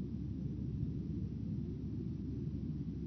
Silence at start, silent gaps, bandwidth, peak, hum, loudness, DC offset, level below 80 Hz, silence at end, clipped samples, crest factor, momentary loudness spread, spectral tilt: 0 s; none; 6.2 kHz; -26 dBFS; none; -42 LUFS; under 0.1%; -50 dBFS; 0 s; under 0.1%; 14 dB; 2 LU; -11.5 dB/octave